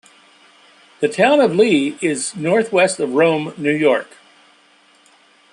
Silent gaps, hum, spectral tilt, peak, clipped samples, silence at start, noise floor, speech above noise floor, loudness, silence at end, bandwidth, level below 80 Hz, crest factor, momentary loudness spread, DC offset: none; none; -4.5 dB/octave; -2 dBFS; under 0.1%; 1 s; -53 dBFS; 37 dB; -16 LUFS; 1.5 s; 11.5 kHz; -68 dBFS; 16 dB; 8 LU; under 0.1%